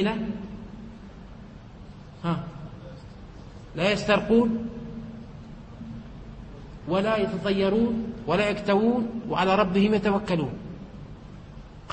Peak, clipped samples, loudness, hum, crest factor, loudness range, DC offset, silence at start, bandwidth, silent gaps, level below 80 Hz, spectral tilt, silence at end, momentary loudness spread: -6 dBFS; under 0.1%; -25 LUFS; none; 20 dB; 10 LU; under 0.1%; 0 s; 8.6 kHz; none; -48 dBFS; -6.5 dB/octave; 0 s; 23 LU